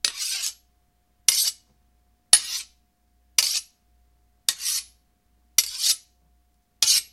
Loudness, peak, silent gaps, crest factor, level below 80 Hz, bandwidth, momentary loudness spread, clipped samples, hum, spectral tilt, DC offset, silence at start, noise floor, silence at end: -22 LUFS; 0 dBFS; none; 28 dB; -64 dBFS; 16 kHz; 11 LU; under 0.1%; none; 4 dB/octave; under 0.1%; 0.05 s; -66 dBFS; 0.1 s